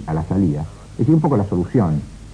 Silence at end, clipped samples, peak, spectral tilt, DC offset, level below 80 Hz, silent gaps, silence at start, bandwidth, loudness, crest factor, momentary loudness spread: 0 s; under 0.1%; -4 dBFS; -10 dB/octave; under 0.1%; -38 dBFS; none; 0 s; 10 kHz; -19 LUFS; 16 dB; 9 LU